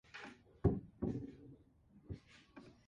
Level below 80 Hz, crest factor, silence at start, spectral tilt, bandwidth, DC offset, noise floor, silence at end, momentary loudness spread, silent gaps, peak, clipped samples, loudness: -56 dBFS; 24 dB; 0.15 s; -9 dB/octave; 7.6 kHz; under 0.1%; -67 dBFS; 0.15 s; 22 LU; none; -20 dBFS; under 0.1%; -43 LUFS